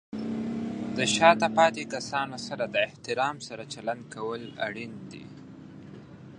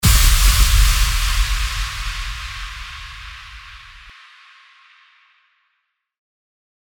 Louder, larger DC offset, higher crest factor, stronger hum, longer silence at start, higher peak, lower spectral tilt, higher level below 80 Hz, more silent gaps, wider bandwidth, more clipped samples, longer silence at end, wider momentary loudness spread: second, -27 LUFS vs -18 LUFS; neither; first, 26 dB vs 18 dB; neither; about the same, 0.1 s vs 0 s; about the same, -4 dBFS vs -2 dBFS; first, -3.5 dB/octave vs -2 dB/octave; second, -66 dBFS vs -20 dBFS; neither; second, 11.5 kHz vs over 20 kHz; neither; second, 0 s vs 2.85 s; about the same, 25 LU vs 23 LU